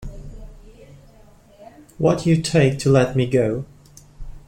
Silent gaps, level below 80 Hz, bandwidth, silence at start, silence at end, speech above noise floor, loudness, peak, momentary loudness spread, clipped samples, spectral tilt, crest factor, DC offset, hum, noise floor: none; -42 dBFS; 15 kHz; 0 s; 0.1 s; 31 dB; -19 LUFS; -4 dBFS; 22 LU; under 0.1%; -6.5 dB/octave; 18 dB; under 0.1%; none; -49 dBFS